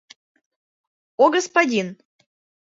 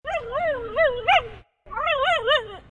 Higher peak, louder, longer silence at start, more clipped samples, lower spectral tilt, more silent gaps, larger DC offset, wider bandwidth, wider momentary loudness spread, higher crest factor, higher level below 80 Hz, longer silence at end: first, -2 dBFS vs -6 dBFS; first, -19 LUFS vs -22 LUFS; first, 1.2 s vs 0.05 s; neither; about the same, -3.5 dB/octave vs -3 dB/octave; neither; neither; second, 8 kHz vs 10.5 kHz; first, 16 LU vs 8 LU; first, 22 dB vs 16 dB; second, -74 dBFS vs -48 dBFS; first, 0.75 s vs 0.1 s